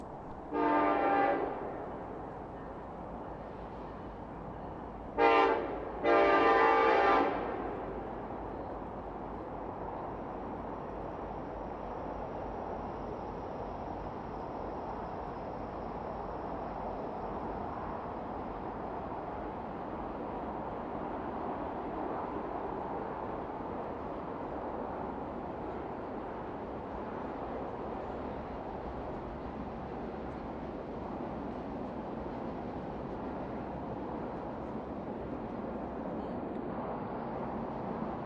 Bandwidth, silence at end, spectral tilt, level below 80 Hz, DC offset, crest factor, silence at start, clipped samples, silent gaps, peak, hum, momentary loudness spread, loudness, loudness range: 7.6 kHz; 0 s; -7.5 dB/octave; -54 dBFS; under 0.1%; 24 dB; 0 s; under 0.1%; none; -12 dBFS; none; 13 LU; -36 LUFS; 12 LU